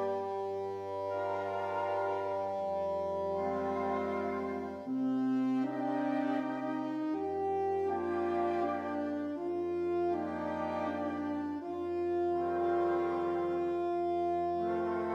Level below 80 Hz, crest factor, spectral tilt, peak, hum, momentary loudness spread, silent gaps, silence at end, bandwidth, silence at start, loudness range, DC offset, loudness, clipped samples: -68 dBFS; 12 dB; -7.5 dB/octave; -22 dBFS; none; 5 LU; none; 0 s; 7.2 kHz; 0 s; 2 LU; under 0.1%; -34 LUFS; under 0.1%